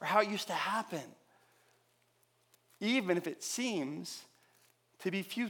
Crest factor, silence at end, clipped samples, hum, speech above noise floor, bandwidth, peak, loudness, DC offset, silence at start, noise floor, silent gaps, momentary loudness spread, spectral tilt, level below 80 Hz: 24 dB; 0 s; under 0.1%; none; 38 dB; 19 kHz; -14 dBFS; -35 LUFS; under 0.1%; 0 s; -73 dBFS; none; 13 LU; -3.5 dB/octave; under -90 dBFS